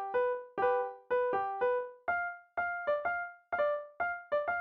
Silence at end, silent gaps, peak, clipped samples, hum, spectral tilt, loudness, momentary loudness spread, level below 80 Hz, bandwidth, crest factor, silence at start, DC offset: 0 s; none; -20 dBFS; under 0.1%; none; -2 dB/octave; -34 LUFS; 5 LU; -72 dBFS; 4.8 kHz; 14 dB; 0 s; under 0.1%